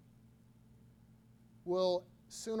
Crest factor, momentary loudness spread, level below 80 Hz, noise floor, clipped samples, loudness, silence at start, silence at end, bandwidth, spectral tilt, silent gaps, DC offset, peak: 20 dB; 17 LU; -74 dBFS; -63 dBFS; under 0.1%; -37 LUFS; 1.65 s; 0 s; 14 kHz; -5 dB/octave; none; under 0.1%; -22 dBFS